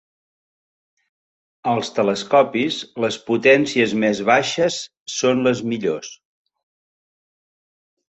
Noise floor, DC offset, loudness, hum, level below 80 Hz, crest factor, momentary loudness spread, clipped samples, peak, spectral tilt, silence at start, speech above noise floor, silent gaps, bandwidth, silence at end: under -90 dBFS; under 0.1%; -19 LUFS; none; -64 dBFS; 20 dB; 11 LU; under 0.1%; -2 dBFS; -4 dB/octave; 1.65 s; over 71 dB; 5.00-5.06 s; 8.2 kHz; 1.95 s